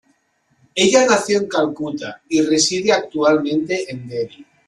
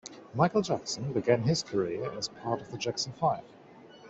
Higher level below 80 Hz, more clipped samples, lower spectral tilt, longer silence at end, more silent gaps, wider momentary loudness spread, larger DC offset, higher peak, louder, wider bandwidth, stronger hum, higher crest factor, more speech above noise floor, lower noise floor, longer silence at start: first, -60 dBFS vs -66 dBFS; neither; second, -3 dB/octave vs -5 dB/octave; first, 0.25 s vs 0 s; neither; first, 13 LU vs 8 LU; neither; first, -2 dBFS vs -10 dBFS; first, -18 LUFS vs -31 LUFS; first, 12 kHz vs 8.2 kHz; neither; about the same, 18 dB vs 22 dB; first, 46 dB vs 23 dB; first, -63 dBFS vs -52 dBFS; first, 0.75 s vs 0.05 s